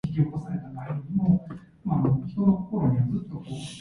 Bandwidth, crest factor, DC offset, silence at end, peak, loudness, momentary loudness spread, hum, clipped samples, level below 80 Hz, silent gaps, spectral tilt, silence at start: 11 kHz; 16 dB; under 0.1%; 0 s; -10 dBFS; -27 LUFS; 12 LU; none; under 0.1%; -50 dBFS; none; -9 dB/octave; 0.05 s